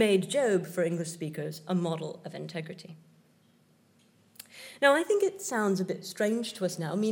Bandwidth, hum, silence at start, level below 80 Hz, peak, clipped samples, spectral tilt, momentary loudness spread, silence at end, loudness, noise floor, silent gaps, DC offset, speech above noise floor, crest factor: 17 kHz; none; 0 s; -90 dBFS; -8 dBFS; under 0.1%; -5 dB/octave; 20 LU; 0 s; -30 LUFS; -64 dBFS; none; under 0.1%; 35 dB; 22 dB